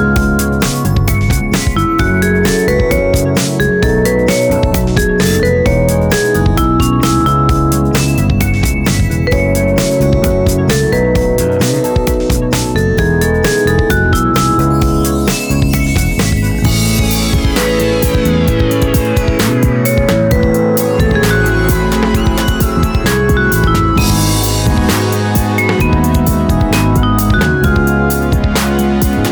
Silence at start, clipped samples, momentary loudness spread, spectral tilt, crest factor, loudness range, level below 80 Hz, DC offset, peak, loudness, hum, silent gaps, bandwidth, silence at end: 0 s; under 0.1%; 2 LU; -5.5 dB/octave; 10 dB; 1 LU; -18 dBFS; under 0.1%; 0 dBFS; -12 LUFS; none; none; over 20 kHz; 0 s